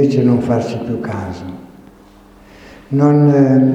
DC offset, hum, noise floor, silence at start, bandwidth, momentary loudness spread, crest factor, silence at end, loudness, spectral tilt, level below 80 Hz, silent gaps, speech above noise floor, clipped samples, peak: under 0.1%; none; -43 dBFS; 0 s; 8.2 kHz; 18 LU; 14 dB; 0 s; -14 LUFS; -9 dB/octave; -48 dBFS; none; 30 dB; under 0.1%; 0 dBFS